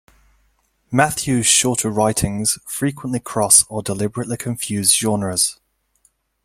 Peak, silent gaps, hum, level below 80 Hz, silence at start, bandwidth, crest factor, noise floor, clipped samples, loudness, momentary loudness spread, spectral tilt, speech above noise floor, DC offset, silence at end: 0 dBFS; none; none; -48 dBFS; 0.9 s; 16.5 kHz; 20 dB; -63 dBFS; under 0.1%; -17 LUFS; 11 LU; -3 dB/octave; 44 dB; under 0.1%; 0.9 s